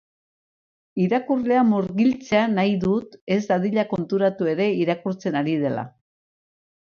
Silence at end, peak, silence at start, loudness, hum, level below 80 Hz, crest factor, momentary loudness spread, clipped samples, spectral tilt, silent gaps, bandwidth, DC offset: 0.95 s; -6 dBFS; 0.95 s; -22 LUFS; none; -60 dBFS; 16 dB; 7 LU; under 0.1%; -7.5 dB/octave; 3.21-3.27 s; 6.8 kHz; under 0.1%